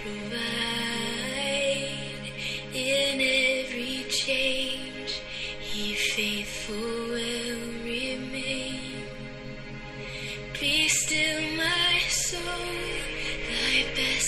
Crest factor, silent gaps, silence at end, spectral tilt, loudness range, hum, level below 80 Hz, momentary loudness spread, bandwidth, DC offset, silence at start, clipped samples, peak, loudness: 18 dB; none; 0 s; -2 dB/octave; 7 LU; none; -46 dBFS; 13 LU; 15 kHz; under 0.1%; 0 s; under 0.1%; -10 dBFS; -27 LUFS